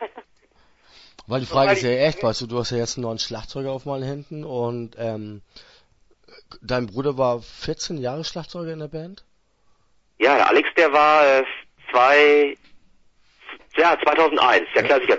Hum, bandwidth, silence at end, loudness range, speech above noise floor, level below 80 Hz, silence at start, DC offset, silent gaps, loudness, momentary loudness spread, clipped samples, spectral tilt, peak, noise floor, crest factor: none; 8 kHz; 0 s; 12 LU; 40 dB; -52 dBFS; 0 s; under 0.1%; none; -20 LUFS; 18 LU; under 0.1%; -4.5 dB/octave; -2 dBFS; -60 dBFS; 18 dB